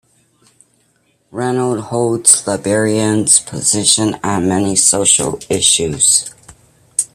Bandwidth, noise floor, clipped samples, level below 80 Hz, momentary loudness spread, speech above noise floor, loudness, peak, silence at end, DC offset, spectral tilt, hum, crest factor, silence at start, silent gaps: over 20 kHz; -59 dBFS; under 0.1%; -50 dBFS; 9 LU; 45 dB; -12 LUFS; 0 dBFS; 0.1 s; under 0.1%; -2.5 dB/octave; none; 16 dB; 1.35 s; none